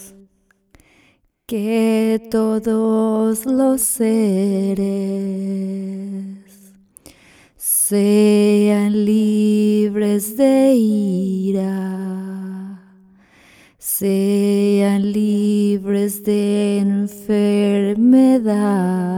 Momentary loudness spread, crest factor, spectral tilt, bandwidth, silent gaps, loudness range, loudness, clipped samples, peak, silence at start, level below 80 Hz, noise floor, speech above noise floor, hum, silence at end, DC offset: 12 LU; 14 dB; -6 dB/octave; 17.5 kHz; none; 7 LU; -17 LUFS; under 0.1%; -2 dBFS; 0 s; -58 dBFS; -57 dBFS; 41 dB; none; 0 s; under 0.1%